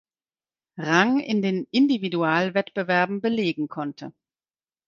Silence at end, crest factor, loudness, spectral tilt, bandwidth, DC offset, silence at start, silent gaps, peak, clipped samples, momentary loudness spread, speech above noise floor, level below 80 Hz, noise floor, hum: 0.75 s; 22 dB; -23 LUFS; -6 dB/octave; 7.2 kHz; under 0.1%; 0.75 s; none; -2 dBFS; under 0.1%; 12 LU; over 67 dB; -72 dBFS; under -90 dBFS; none